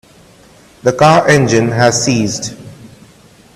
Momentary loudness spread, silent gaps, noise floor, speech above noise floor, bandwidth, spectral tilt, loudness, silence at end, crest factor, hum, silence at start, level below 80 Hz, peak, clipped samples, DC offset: 13 LU; none; -43 dBFS; 32 dB; 14 kHz; -4.5 dB/octave; -11 LUFS; 0.7 s; 14 dB; none; 0.85 s; -46 dBFS; 0 dBFS; under 0.1%; under 0.1%